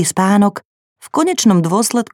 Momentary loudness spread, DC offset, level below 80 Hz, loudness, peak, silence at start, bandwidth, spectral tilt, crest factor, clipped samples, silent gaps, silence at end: 7 LU; under 0.1%; -60 dBFS; -14 LUFS; 0 dBFS; 0 s; 16 kHz; -5 dB/octave; 14 dB; under 0.1%; 0.65-0.96 s; 0.1 s